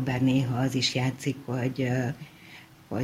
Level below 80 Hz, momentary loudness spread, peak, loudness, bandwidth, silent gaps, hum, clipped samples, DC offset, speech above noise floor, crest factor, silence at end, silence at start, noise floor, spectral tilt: -58 dBFS; 19 LU; -14 dBFS; -28 LUFS; 15.5 kHz; none; none; under 0.1%; under 0.1%; 23 dB; 14 dB; 0 s; 0 s; -50 dBFS; -5.5 dB/octave